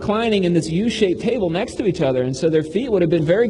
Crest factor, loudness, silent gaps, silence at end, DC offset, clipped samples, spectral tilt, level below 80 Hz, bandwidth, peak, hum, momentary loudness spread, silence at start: 14 dB; -19 LUFS; none; 0 s; under 0.1%; under 0.1%; -6.5 dB/octave; -46 dBFS; 11 kHz; -4 dBFS; none; 4 LU; 0 s